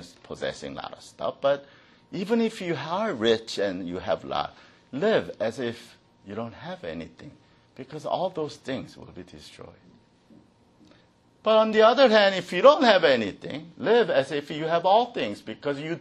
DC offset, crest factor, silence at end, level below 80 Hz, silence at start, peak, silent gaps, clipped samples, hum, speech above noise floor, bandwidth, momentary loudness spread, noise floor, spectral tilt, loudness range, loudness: under 0.1%; 22 dB; 0 s; -64 dBFS; 0 s; -4 dBFS; none; under 0.1%; none; 35 dB; 12 kHz; 21 LU; -60 dBFS; -5 dB/octave; 15 LU; -24 LUFS